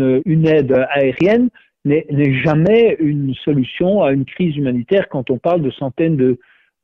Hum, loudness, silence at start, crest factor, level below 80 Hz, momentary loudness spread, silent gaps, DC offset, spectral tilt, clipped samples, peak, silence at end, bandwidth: none; -16 LUFS; 0 s; 12 dB; -48 dBFS; 7 LU; none; under 0.1%; -9.5 dB/octave; under 0.1%; -4 dBFS; 0.45 s; 6.2 kHz